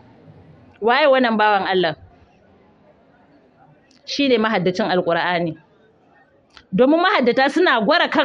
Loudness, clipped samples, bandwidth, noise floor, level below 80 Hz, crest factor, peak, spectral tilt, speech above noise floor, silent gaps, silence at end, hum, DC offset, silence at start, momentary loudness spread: -17 LUFS; under 0.1%; 10 kHz; -55 dBFS; -62 dBFS; 16 dB; -4 dBFS; -5.5 dB/octave; 38 dB; none; 0 s; none; under 0.1%; 0.8 s; 10 LU